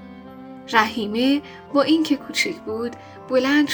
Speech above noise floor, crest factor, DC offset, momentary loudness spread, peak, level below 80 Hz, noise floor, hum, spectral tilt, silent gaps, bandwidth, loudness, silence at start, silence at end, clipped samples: 18 dB; 22 dB; under 0.1%; 21 LU; 0 dBFS; -62 dBFS; -39 dBFS; none; -3.5 dB/octave; none; over 20 kHz; -21 LUFS; 0 s; 0 s; under 0.1%